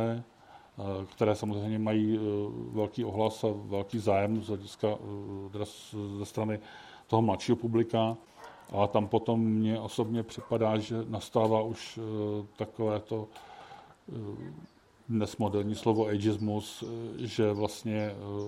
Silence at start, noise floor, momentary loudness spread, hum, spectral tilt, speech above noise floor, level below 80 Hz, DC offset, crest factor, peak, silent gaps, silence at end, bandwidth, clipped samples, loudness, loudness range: 0 s; -52 dBFS; 14 LU; none; -7 dB/octave; 21 dB; -68 dBFS; under 0.1%; 22 dB; -10 dBFS; none; 0 s; 14 kHz; under 0.1%; -32 LUFS; 5 LU